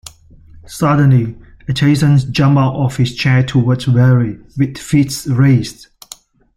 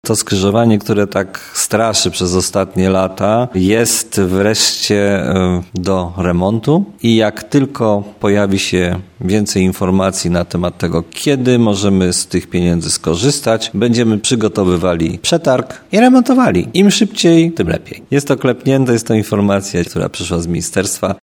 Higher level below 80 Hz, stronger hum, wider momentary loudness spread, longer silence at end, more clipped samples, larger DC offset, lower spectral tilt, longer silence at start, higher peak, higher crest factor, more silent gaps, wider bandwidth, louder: about the same, -42 dBFS vs -40 dBFS; neither; first, 11 LU vs 6 LU; first, 0.85 s vs 0.05 s; neither; neither; first, -6.5 dB/octave vs -5 dB/octave; first, 0.7 s vs 0.05 s; about the same, 0 dBFS vs 0 dBFS; about the same, 12 dB vs 14 dB; neither; second, 14.5 kHz vs 18 kHz; about the same, -13 LUFS vs -14 LUFS